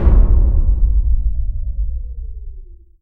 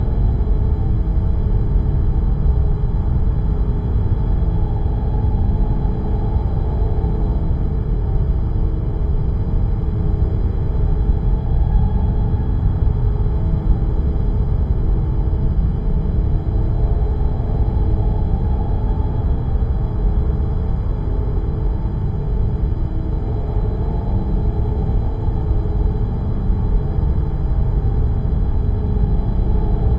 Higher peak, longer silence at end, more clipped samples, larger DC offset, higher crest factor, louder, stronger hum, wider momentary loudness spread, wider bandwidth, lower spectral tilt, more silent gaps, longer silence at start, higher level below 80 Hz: first, 0 dBFS vs -4 dBFS; first, 0.35 s vs 0 s; neither; neither; about the same, 14 dB vs 12 dB; about the same, -19 LUFS vs -20 LUFS; neither; first, 18 LU vs 3 LU; second, 2.1 kHz vs 4.2 kHz; about the same, -12.5 dB/octave vs -11.5 dB/octave; neither; about the same, 0 s vs 0 s; about the same, -14 dBFS vs -18 dBFS